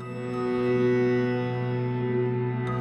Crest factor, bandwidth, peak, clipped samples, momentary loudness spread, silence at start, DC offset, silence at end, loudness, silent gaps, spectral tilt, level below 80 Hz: 12 dB; 8.4 kHz; -14 dBFS; under 0.1%; 5 LU; 0 s; under 0.1%; 0 s; -26 LUFS; none; -9 dB/octave; -58 dBFS